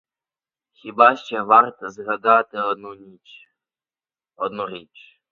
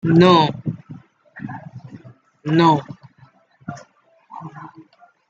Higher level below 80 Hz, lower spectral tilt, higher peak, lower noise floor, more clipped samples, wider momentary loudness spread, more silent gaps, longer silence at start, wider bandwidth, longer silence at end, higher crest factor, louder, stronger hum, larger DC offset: second, -72 dBFS vs -60 dBFS; second, -5 dB/octave vs -7.5 dB/octave; about the same, 0 dBFS vs -2 dBFS; first, under -90 dBFS vs -54 dBFS; neither; second, 19 LU vs 27 LU; neither; first, 0.85 s vs 0.05 s; about the same, 7.2 kHz vs 7.8 kHz; second, 0.5 s vs 0.65 s; about the same, 22 dB vs 20 dB; second, -19 LUFS vs -16 LUFS; neither; neither